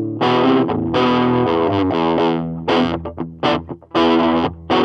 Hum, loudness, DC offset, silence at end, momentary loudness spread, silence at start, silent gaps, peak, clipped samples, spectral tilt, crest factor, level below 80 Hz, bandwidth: none; -17 LUFS; under 0.1%; 0 s; 7 LU; 0 s; none; -2 dBFS; under 0.1%; -7 dB/octave; 14 dB; -44 dBFS; 7.4 kHz